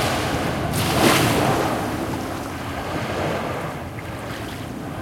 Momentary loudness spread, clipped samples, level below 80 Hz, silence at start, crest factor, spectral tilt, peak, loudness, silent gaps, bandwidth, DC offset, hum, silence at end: 14 LU; under 0.1%; -42 dBFS; 0 s; 20 dB; -4.5 dB/octave; -2 dBFS; -23 LUFS; none; 16.5 kHz; under 0.1%; none; 0 s